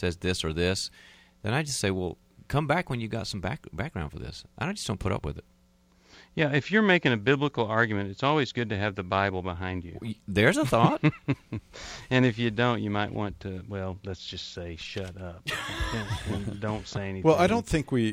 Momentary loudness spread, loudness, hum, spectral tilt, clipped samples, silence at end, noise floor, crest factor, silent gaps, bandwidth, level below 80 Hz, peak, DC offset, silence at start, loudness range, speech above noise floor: 15 LU; -28 LUFS; none; -5.5 dB/octave; under 0.1%; 0 s; -62 dBFS; 22 dB; none; 15.5 kHz; -48 dBFS; -6 dBFS; under 0.1%; 0 s; 8 LU; 34 dB